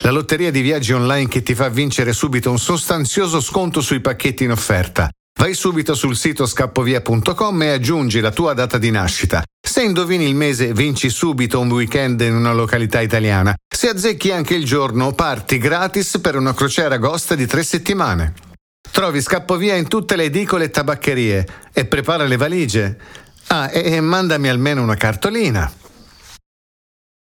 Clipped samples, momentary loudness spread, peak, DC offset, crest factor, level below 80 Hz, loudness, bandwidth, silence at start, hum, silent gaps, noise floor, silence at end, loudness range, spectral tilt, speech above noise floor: under 0.1%; 3 LU; -2 dBFS; under 0.1%; 16 dB; -38 dBFS; -17 LUFS; over 20 kHz; 0 s; none; 5.20-5.35 s, 9.53-9.64 s, 13.65-13.71 s, 18.61-18.84 s; -43 dBFS; 1 s; 2 LU; -5 dB/octave; 26 dB